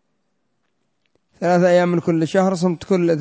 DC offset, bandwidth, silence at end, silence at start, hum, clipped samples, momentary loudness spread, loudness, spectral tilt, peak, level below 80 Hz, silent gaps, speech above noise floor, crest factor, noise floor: under 0.1%; 8 kHz; 0 s; 1.4 s; none; under 0.1%; 5 LU; -18 LUFS; -7 dB/octave; -4 dBFS; -60 dBFS; none; 55 dB; 14 dB; -72 dBFS